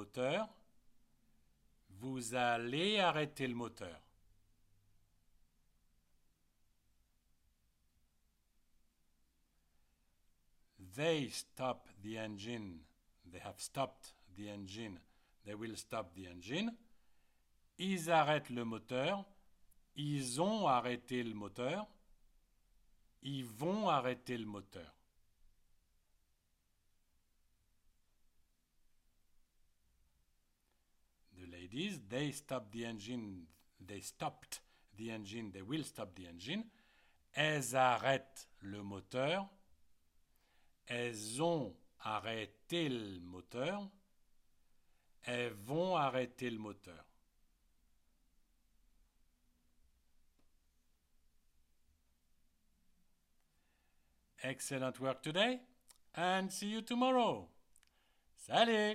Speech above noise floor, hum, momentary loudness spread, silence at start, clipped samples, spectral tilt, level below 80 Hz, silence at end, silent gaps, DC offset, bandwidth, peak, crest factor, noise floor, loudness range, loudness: 39 dB; none; 18 LU; 0 s; under 0.1%; -4.5 dB/octave; -74 dBFS; 0 s; none; under 0.1%; 16 kHz; -18 dBFS; 26 dB; -79 dBFS; 9 LU; -39 LUFS